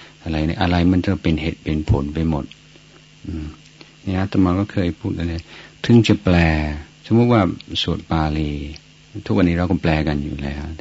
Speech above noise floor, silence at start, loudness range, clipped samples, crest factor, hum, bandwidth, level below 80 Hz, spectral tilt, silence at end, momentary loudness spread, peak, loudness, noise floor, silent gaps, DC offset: 28 dB; 0 s; 6 LU; under 0.1%; 18 dB; none; 8 kHz; -32 dBFS; -7.5 dB/octave; 0.05 s; 17 LU; -2 dBFS; -19 LUFS; -47 dBFS; none; under 0.1%